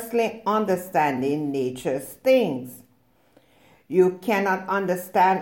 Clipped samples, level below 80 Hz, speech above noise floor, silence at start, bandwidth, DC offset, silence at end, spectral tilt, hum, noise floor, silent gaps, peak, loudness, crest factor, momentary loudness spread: under 0.1%; -66 dBFS; 40 dB; 0 s; 17 kHz; under 0.1%; 0 s; -6 dB/octave; none; -62 dBFS; none; -6 dBFS; -23 LUFS; 16 dB; 7 LU